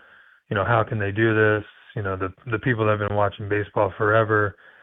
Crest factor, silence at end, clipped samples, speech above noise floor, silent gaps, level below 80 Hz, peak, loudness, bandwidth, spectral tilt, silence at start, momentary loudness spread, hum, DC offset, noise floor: 18 dB; 0.3 s; under 0.1%; 31 dB; none; -54 dBFS; -4 dBFS; -23 LUFS; 3.9 kHz; -10.5 dB/octave; 0.5 s; 9 LU; none; under 0.1%; -53 dBFS